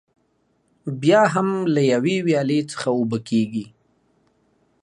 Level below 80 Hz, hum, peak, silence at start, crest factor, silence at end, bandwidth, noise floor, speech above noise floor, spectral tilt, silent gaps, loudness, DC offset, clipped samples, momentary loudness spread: -68 dBFS; none; -4 dBFS; 0.85 s; 18 dB; 1.15 s; 11.5 kHz; -66 dBFS; 46 dB; -6 dB/octave; none; -20 LUFS; under 0.1%; under 0.1%; 11 LU